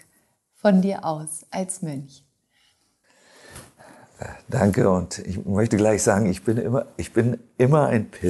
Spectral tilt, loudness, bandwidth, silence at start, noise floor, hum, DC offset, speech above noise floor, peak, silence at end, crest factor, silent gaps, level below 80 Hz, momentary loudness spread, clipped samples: -6.5 dB/octave; -22 LUFS; 12.5 kHz; 0.65 s; -65 dBFS; none; under 0.1%; 43 dB; -4 dBFS; 0 s; 18 dB; none; -46 dBFS; 18 LU; under 0.1%